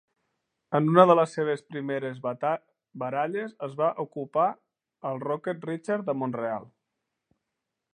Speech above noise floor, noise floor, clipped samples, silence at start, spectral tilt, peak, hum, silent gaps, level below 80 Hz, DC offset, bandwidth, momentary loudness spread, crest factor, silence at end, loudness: 58 dB; -84 dBFS; under 0.1%; 0.7 s; -7.5 dB/octave; -2 dBFS; none; none; -80 dBFS; under 0.1%; 9.8 kHz; 15 LU; 26 dB; 1.25 s; -27 LUFS